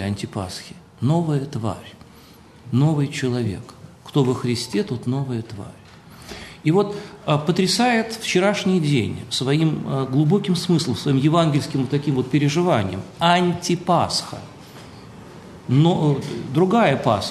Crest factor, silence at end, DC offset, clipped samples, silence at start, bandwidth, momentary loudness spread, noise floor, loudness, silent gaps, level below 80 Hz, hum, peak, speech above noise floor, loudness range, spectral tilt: 18 dB; 0 s; under 0.1%; under 0.1%; 0 s; 13 kHz; 19 LU; -46 dBFS; -21 LUFS; none; -56 dBFS; none; -2 dBFS; 26 dB; 5 LU; -6 dB/octave